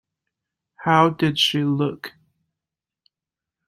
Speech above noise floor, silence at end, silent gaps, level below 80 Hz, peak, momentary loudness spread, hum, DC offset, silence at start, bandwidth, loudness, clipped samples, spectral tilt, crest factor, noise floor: 69 dB; 1.6 s; none; -62 dBFS; -2 dBFS; 15 LU; none; under 0.1%; 0.8 s; 16 kHz; -20 LUFS; under 0.1%; -5 dB/octave; 22 dB; -88 dBFS